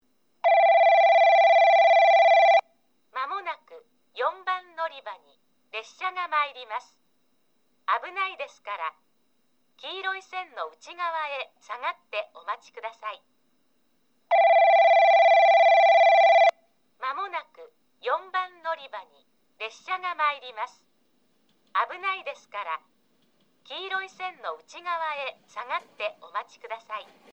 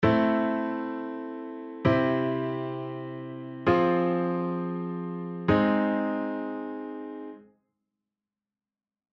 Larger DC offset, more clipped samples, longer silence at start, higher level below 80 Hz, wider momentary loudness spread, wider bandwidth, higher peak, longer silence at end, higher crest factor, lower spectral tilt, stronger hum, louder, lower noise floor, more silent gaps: neither; neither; first, 0.45 s vs 0 s; second, -90 dBFS vs -56 dBFS; first, 20 LU vs 15 LU; first, 7.6 kHz vs 6.2 kHz; about the same, -8 dBFS vs -10 dBFS; second, 0.3 s vs 1.75 s; about the same, 16 dB vs 20 dB; second, -0.5 dB/octave vs -9 dB/octave; neither; first, -22 LUFS vs -28 LUFS; second, -71 dBFS vs under -90 dBFS; neither